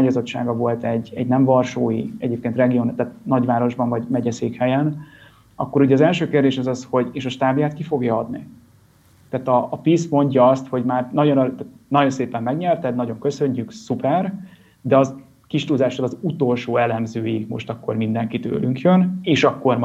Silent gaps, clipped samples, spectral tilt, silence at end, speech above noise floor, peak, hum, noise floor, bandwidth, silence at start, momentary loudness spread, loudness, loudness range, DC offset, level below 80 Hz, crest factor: none; under 0.1%; -7.5 dB/octave; 0 s; 34 dB; -2 dBFS; none; -53 dBFS; 8.2 kHz; 0 s; 9 LU; -20 LUFS; 3 LU; under 0.1%; -60 dBFS; 16 dB